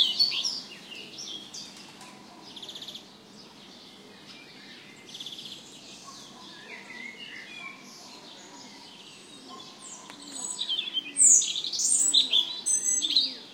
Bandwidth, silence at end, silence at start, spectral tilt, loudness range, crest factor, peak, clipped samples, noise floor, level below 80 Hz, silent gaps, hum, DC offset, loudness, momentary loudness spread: 16 kHz; 0 s; 0 s; 2 dB/octave; 21 LU; 26 dB; -6 dBFS; under 0.1%; -50 dBFS; -80 dBFS; none; none; under 0.1%; -23 LUFS; 26 LU